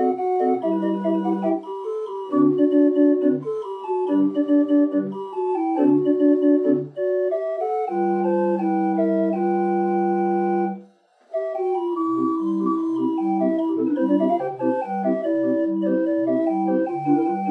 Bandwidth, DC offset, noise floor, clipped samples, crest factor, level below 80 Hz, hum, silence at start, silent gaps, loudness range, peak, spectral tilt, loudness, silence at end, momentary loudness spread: 3.7 kHz; under 0.1%; -53 dBFS; under 0.1%; 14 dB; under -90 dBFS; none; 0 s; none; 3 LU; -6 dBFS; -10 dB/octave; -21 LUFS; 0 s; 7 LU